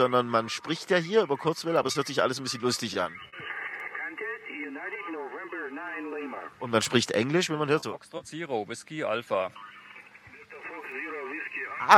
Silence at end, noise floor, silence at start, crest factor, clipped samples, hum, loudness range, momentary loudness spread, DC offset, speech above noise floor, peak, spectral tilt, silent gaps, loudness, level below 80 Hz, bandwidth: 0 s; -51 dBFS; 0 s; 28 dB; under 0.1%; none; 7 LU; 15 LU; under 0.1%; 22 dB; -2 dBFS; -4 dB/octave; none; -30 LUFS; -76 dBFS; 14 kHz